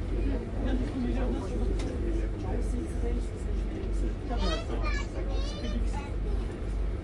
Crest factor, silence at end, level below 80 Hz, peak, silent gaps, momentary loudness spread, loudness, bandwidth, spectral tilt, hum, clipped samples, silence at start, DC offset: 14 dB; 0 s; -32 dBFS; -16 dBFS; none; 3 LU; -33 LUFS; 10.5 kHz; -7 dB/octave; none; under 0.1%; 0 s; under 0.1%